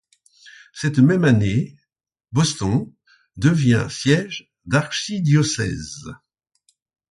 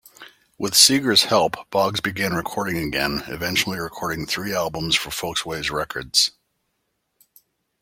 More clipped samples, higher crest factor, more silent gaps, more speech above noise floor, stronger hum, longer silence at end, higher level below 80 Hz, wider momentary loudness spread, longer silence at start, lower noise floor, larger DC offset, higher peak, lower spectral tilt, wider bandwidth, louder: neither; second, 18 dB vs 24 dB; neither; first, 60 dB vs 52 dB; neither; second, 0.95 s vs 1.5 s; about the same, -48 dBFS vs -50 dBFS; first, 17 LU vs 12 LU; first, 0.45 s vs 0.2 s; first, -78 dBFS vs -74 dBFS; neither; second, -4 dBFS vs 0 dBFS; first, -5.5 dB/octave vs -2 dB/octave; second, 11.5 kHz vs 16.5 kHz; about the same, -19 LUFS vs -20 LUFS